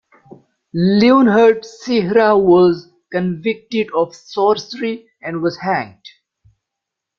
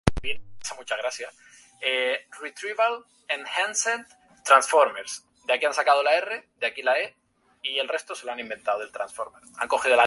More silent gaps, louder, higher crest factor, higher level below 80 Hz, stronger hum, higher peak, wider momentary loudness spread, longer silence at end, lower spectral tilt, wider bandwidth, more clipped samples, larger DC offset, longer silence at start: neither; first, -15 LUFS vs -25 LUFS; second, 14 dB vs 26 dB; second, -56 dBFS vs -50 dBFS; neither; about the same, -2 dBFS vs 0 dBFS; about the same, 14 LU vs 15 LU; first, 1.1 s vs 0 s; first, -7 dB/octave vs -2.5 dB/octave; second, 7.2 kHz vs 11.5 kHz; neither; neither; first, 0.75 s vs 0.05 s